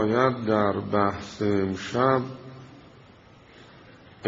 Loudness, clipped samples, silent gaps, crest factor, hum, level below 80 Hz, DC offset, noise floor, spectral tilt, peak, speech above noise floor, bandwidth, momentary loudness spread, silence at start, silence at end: -25 LUFS; under 0.1%; none; 20 dB; none; -60 dBFS; under 0.1%; -52 dBFS; -5.5 dB/octave; -6 dBFS; 27 dB; 7.6 kHz; 17 LU; 0 s; 0 s